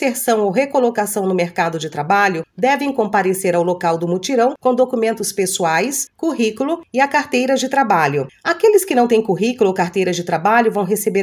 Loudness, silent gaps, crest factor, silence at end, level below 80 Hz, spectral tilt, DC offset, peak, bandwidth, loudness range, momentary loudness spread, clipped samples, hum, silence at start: -17 LUFS; none; 16 dB; 0 s; -64 dBFS; -4.5 dB/octave; under 0.1%; 0 dBFS; 16 kHz; 2 LU; 5 LU; under 0.1%; none; 0 s